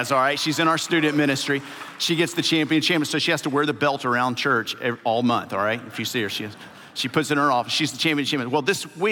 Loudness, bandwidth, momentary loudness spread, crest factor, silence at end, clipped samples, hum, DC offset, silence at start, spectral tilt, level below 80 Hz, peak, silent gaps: -22 LUFS; 17 kHz; 7 LU; 18 dB; 0 s; under 0.1%; none; under 0.1%; 0 s; -4 dB/octave; -78 dBFS; -6 dBFS; none